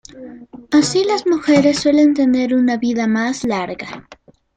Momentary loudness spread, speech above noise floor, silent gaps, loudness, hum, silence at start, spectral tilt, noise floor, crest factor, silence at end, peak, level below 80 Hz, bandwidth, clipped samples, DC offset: 19 LU; 21 dB; none; -16 LUFS; none; 0.15 s; -4.5 dB/octave; -36 dBFS; 14 dB; 0.4 s; -2 dBFS; -54 dBFS; 9.2 kHz; under 0.1%; under 0.1%